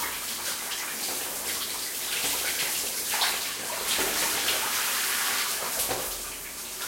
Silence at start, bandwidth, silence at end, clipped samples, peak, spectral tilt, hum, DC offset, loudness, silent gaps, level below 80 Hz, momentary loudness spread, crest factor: 0 s; 16.5 kHz; 0 s; under 0.1%; -12 dBFS; 0.5 dB/octave; none; under 0.1%; -27 LUFS; none; -58 dBFS; 5 LU; 18 dB